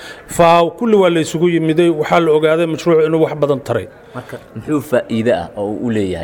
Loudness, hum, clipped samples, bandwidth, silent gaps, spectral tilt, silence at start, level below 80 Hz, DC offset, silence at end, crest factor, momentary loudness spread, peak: -14 LUFS; none; under 0.1%; 18 kHz; none; -6 dB/octave; 0 s; -48 dBFS; under 0.1%; 0 s; 14 dB; 14 LU; -2 dBFS